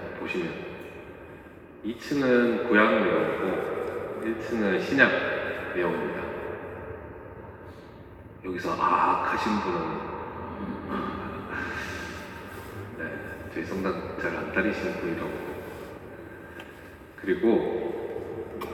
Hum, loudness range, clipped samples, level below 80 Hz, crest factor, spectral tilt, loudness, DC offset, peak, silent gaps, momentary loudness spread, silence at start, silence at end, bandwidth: none; 9 LU; under 0.1%; -56 dBFS; 24 dB; -6 dB/octave; -28 LUFS; under 0.1%; -6 dBFS; none; 20 LU; 0 s; 0 s; 18 kHz